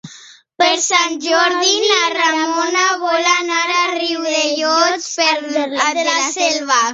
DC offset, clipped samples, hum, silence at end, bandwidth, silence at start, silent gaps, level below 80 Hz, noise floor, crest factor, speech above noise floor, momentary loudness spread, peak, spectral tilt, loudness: under 0.1%; under 0.1%; none; 0 s; 8 kHz; 0.05 s; none; -68 dBFS; -42 dBFS; 16 dB; 26 dB; 4 LU; 0 dBFS; 0 dB/octave; -15 LUFS